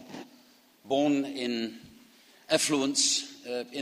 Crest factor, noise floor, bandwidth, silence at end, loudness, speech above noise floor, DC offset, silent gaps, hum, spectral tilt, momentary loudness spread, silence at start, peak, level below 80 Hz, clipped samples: 22 dB; -60 dBFS; 15.5 kHz; 0 s; -28 LUFS; 31 dB; under 0.1%; none; none; -2 dB/octave; 13 LU; 0 s; -8 dBFS; -72 dBFS; under 0.1%